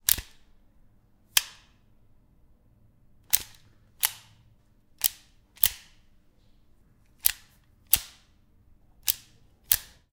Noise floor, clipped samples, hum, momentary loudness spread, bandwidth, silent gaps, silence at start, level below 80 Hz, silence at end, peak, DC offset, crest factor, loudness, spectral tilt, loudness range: -60 dBFS; under 0.1%; none; 21 LU; 18 kHz; none; 0.1 s; -56 dBFS; 0.3 s; 0 dBFS; under 0.1%; 34 dB; -26 LUFS; 1.5 dB/octave; 4 LU